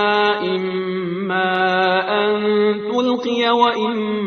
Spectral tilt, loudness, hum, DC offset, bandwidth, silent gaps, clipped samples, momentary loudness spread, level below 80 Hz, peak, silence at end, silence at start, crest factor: -6 dB/octave; -18 LUFS; none; under 0.1%; 6.6 kHz; none; under 0.1%; 6 LU; -62 dBFS; -2 dBFS; 0 s; 0 s; 16 dB